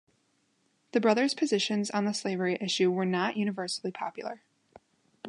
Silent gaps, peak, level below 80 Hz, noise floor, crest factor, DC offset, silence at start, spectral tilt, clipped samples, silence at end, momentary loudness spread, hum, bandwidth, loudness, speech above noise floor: none; -10 dBFS; -80 dBFS; -72 dBFS; 20 dB; under 0.1%; 0.95 s; -4.5 dB/octave; under 0.1%; 0 s; 11 LU; none; 11 kHz; -29 LUFS; 43 dB